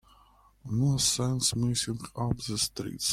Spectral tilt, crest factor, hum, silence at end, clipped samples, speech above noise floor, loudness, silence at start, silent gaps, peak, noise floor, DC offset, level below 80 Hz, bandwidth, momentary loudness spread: -4 dB/octave; 18 dB; none; 0 s; under 0.1%; 31 dB; -28 LUFS; 0.65 s; none; -12 dBFS; -60 dBFS; under 0.1%; -52 dBFS; 16 kHz; 8 LU